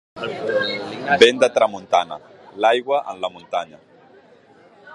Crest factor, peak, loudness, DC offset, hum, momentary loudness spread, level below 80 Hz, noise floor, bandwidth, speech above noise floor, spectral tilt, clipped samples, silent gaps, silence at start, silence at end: 20 dB; 0 dBFS; -19 LUFS; under 0.1%; none; 16 LU; -64 dBFS; -50 dBFS; 11 kHz; 31 dB; -3 dB/octave; under 0.1%; none; 0.15 s; 0 s